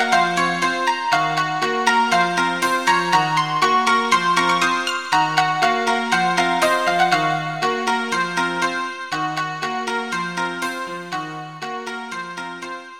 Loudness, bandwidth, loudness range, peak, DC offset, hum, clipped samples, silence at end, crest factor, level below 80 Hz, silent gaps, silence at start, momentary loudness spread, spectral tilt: -19 LUFS; 16.5 kHz; 8 LU; -4 dBFS; 0.3%; none; under 0.1%; 0 s; 16 dB; -62 dBFS; none; 0 s; 12 LU; -3 dB/octave